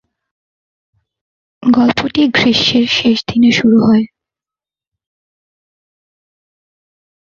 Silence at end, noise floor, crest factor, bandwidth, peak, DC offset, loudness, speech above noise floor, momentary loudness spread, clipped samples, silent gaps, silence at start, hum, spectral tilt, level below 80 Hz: 3.25 s; -90 dBFS; 14 dB; 7.2 kHz; -2 dBFS; under 0.1%; -11 LUFS; 79 dB; 4 LU; under 0.1%; none; 1.6 s; none; -5 dB/octave; -50 dBFS